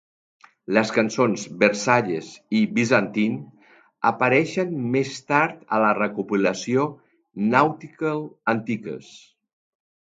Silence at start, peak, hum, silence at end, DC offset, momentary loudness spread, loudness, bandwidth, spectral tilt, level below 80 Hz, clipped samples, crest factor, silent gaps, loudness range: 0.7 s; -2 dBFS; none; 0.9 s; under 0.1%; 9 LU; -22 LUFS; 9 kHz; -5.5 dB/octave; -68 dBFS; under 0.1%; 22 dB; none; 3 LU